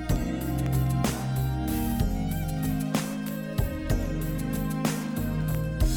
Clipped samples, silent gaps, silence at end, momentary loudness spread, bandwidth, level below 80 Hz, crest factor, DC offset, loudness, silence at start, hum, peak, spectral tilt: under 0.1%; none; 0 s; 4 LU; over 20 kHz; -34 dBFS; 16 dB; under 0.1%; -29 LUFS; 0 s; none; -12 dBFS; -6 dB/octave